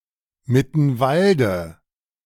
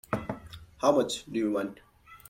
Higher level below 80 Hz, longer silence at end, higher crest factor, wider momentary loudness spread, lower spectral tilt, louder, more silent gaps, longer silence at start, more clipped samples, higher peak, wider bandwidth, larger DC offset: first, -50 dBFS vs -58 dBFS; first, 0.55 s vs 0.15 s; about the same, 16 dB vs 20 dB; second, 9 LU vs 16 LU; first, -7.5 dB/octave vs -5 dB/octave; first, -19 LUFS vs -30 LUFS; neither; first, 0.5 s vs 0.1 s; neither; first, -4 dBFS vs -10 dBFS; about the same, 15.5 kHz vs 16.5 kHz; neither